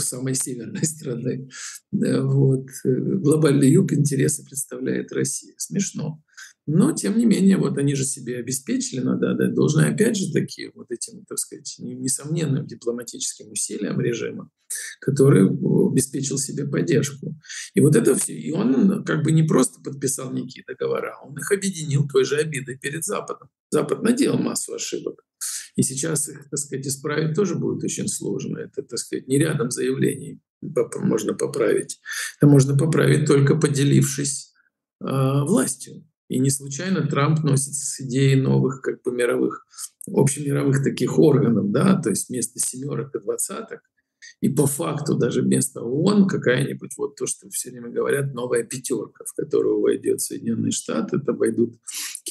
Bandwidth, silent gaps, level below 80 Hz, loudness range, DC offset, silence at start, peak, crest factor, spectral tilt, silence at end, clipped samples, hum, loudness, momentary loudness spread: 12.5 kHz; 23.60-23.70 s, 30.50-30.61 s, 34.95-34.99 s, 36.17-36.28 s; -68 dBFS; 5 LU; under 0.1%; 0 s; -4 dBFS; 18 dB; -5.5 dB/octave; 0 s; under 0.1%; none; -22 LUFS; 12 LU